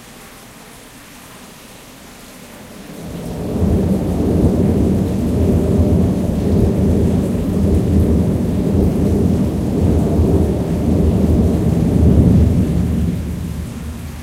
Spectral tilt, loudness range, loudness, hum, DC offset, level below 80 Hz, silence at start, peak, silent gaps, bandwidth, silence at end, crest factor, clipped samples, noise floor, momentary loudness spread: -8.5 dB/octave; 9 LU; -16 LUFS; none; under 0.1%; -24 dBFS; 0 s; 0 dBFS; none; 15.5 kHz; 0 s; 16 dB; under 0.1%; -38 dBFS; 22 LU